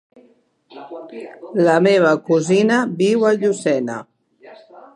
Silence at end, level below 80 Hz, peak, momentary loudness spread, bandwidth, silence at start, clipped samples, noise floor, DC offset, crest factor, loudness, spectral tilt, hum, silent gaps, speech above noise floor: 0.15 s; -70 dBFS; -2 dBFS; 21 LU; 11.5 kHz; 0.75 s; under 0.1%; -56 dBFS; under 0.1%; 18 dB; -16 LUFS; -6 dB/octave; none; none; 39 dB